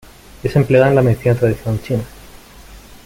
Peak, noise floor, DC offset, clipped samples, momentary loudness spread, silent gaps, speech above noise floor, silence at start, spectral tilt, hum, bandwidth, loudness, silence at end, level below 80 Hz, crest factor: -2 dBFS; -39 dBFS; under 0.1%; under 0.1%; 11 LU; none; 25 dB; 0.45 s; -8 dB/octave; none; 16.5 kHz; -16 LUFS; 0.25 s; -40 dBFS; 16 dB